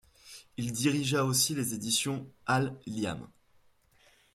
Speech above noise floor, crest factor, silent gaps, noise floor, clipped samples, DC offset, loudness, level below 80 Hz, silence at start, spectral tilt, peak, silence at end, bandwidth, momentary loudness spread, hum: 34 dB; 18 dB; none; -65 dBFS; under 0.1%; under 0.1%; -30 LUFS; -66 dBFS; 0.25 s; -3.5 dB/octave; -14 dBFS; 1.1 s; 16 kHz; 16 LU; none